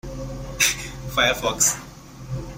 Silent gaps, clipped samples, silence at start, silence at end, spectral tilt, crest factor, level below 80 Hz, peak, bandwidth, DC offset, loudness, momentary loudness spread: none; under 0.1%; 0.05 s; 0 s; -1.5 dB/octave; 22 dB; -40 dBFS; -2 dBFS; 16.5 kHz; under 0.1%; -21 LUFS; 15 LU